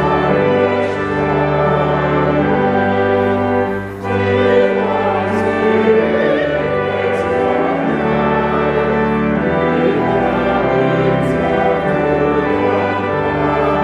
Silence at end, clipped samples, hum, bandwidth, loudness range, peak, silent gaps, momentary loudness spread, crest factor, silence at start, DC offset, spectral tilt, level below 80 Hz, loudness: 0 s; under 0.1%; none; 10.5 kHz; 1 LU; -2 dBFS; none; 3 LU; 12 dB; 0 s; under 0.1%; -8 dB/octave; -36 dBFS; -15 LUFS